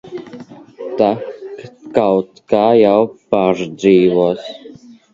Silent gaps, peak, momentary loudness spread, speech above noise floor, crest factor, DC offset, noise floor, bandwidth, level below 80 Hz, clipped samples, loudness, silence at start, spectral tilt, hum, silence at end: none; 0 dBFS; 21 LU; 26 dB; 16 dB; under 0.1%; -39 dBFS; 7.6 kHz; -56 dBFS; under 0.1%; -14 LUFS; 0.05 s; -7 dB/octave; none; 0.45 s